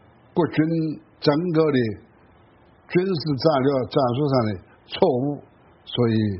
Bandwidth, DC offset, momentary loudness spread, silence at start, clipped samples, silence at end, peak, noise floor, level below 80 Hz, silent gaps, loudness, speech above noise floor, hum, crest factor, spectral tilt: 5.8 kHz; under 0.1%; 10 LU; 0.35 s; under 0.1%; 0 s; -4 dBFS; -54 dBFS; -58 dBFS; none; -22 LUFS; 33 dB; none; 20 dB; -6 dB/octave